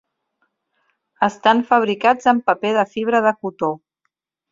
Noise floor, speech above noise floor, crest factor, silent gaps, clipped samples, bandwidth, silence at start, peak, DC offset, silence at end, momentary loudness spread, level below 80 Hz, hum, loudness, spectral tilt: -74 dBFS; 57 dB; 18 dB; none; under 0.1%; 7.6 kHz; 1.2 s; -2 dBFS; under 0.1%; 0.75 s; 8 LU; -66 dBFS; none; -18 LUFS; -5 dB/octave